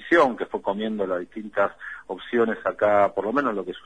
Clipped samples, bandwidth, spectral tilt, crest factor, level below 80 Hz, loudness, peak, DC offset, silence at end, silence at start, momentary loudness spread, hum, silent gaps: under 0.1%; 9.8 kHz; -6.5 dB/octave; 18 dB; -60 dBFS; -24 LUFS; -6 dBFS; 0.2%; 0.05 s; 0 s; 11 LU; none; none